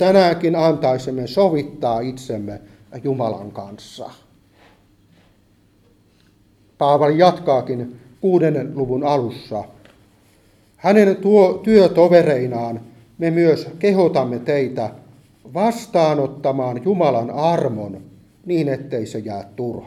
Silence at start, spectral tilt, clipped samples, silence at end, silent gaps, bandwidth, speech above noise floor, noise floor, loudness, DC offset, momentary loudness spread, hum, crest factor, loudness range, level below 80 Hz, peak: 0 s; -7.5 dB/octave; under 0.1%; 0 s; none; 13 kHz; 38 dB; -56 dBFS; -18 LUFS; under 0.1%; 17 LU; none; 18 dB; 11 LU; -56 dBFS; 0 dBFS